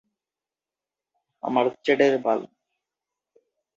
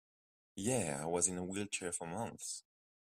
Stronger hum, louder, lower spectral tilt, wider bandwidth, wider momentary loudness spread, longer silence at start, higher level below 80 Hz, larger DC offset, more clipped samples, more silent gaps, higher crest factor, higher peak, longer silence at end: neither; first, -23 LUFS vs -38 LUFS; first, -5.5 dB/octave vs -3.5 dB/octave; second, 7.6 kHz vs 15.5 kHz; about the same, 8 LU vs 10 LU; first, 1.45 s vs 0.55 s; about the same, -76 dBFS vs -72 dBFS; neither; neither; neither; about the same, 20 dB vs 24 dB; first, -6 dBFS vs -16 dBFS; first, 1.3 s vs 0.6 s